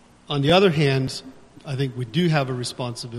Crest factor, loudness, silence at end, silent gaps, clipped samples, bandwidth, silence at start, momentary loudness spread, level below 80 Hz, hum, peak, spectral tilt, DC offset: 22 dB; -22 LUFS; 0 s; none; under 0.1%; 12.5 kHz; 0.3 s; 14 LU; -54 dBFS; none; -2 dBFS; -6 dB/octave; under 0.1%